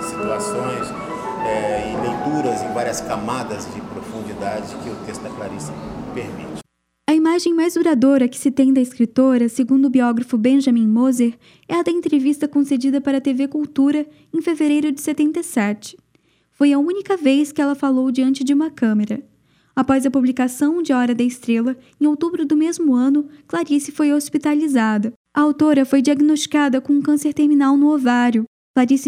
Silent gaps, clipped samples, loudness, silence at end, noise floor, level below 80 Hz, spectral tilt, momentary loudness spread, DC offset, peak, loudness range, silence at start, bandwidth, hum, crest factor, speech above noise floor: 25.16-25.25 s, 28.47-28.74 s; under 0.1%; -18 LUFS; 0 s; -60 dBFS; -54 dBFS; -5 dB/octave; 14 LU; under 0.1%; -4 dBFS; 8 LU; 0 s; 15 kHz; none; 14 dB; 43 dB